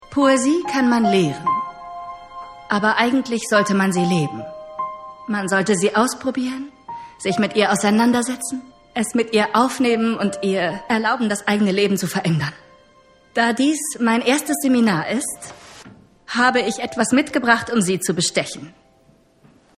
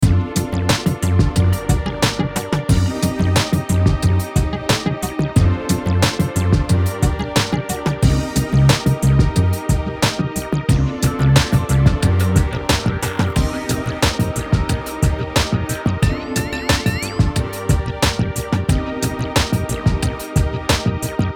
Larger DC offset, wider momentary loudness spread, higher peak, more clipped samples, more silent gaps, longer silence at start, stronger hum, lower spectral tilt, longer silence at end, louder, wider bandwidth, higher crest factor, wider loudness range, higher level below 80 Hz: neither; first, 15 LU vs 6 LU; about the same, 0 dBFS vs 0 dBFS; neither; neither; about the same, 0 s vs 0 s; neither; about the same, -4.5 dB/octave vs -5.5 dB/octave; first, 1.1 s vs 0 s; about the same, -19 LUFS vs -18 LUFS; second, 15 kHz vs 19 kHz; about the same, 20 dB vs 16 dB; about the same, 2 LU vs 3 LU; second, -58 dBFS vs -26 dBFS